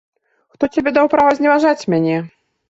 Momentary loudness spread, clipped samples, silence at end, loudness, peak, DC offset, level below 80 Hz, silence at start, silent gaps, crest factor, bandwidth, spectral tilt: 10 LU; under 0.1%; 0.45 s; -15 LUFS; -2 dBFS; under 0.1%; -54 dBFS; 0.6 s; none; 14 dB; 7.8 kHz; -6.5 dB/octave